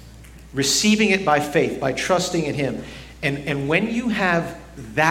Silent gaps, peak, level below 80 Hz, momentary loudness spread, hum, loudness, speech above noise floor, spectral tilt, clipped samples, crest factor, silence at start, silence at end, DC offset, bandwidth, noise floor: none; -2 dBFS; -46 dBFS; 13 LU; none; -20 LUFS; 21 dB; -4 dB/octave; under 0.1%; 20 dB; 0 s; 0 s; under 0.1%; 16.5 kHz; -42 dBFS